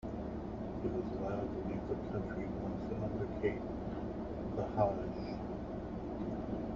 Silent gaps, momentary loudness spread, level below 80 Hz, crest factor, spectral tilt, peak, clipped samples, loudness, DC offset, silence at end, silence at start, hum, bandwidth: none; 7 LU; -50 dBFS; 22 dB; -8 dB/octave; -16 dBFS; under 0.1%; -40 LUFS; under 0.1%; 0 s; 0 s; none; 7.4 kHz